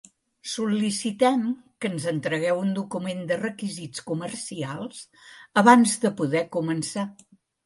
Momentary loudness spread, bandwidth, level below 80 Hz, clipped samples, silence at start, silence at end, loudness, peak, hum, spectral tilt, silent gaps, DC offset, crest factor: 15 LU; 11.5 kHz; -70 dBFS; under 0.1%; 0.45 s; 0.55 s; -25 LUFS; -2 dBFS; none; -4.5 dB/octave; none; under 0.1%; 22 dB